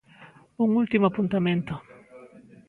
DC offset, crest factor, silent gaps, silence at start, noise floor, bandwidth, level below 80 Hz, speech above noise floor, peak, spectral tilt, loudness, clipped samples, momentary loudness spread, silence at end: under 0.1%; 18 dB; none; 0.2 s; -52 dBFS; 4.3 kHz; -60 dBFS; 28 dB; -8 dBFS; -9 dB/octave; -24 LUFS; under 0.1%; 11 LU; 0.3 s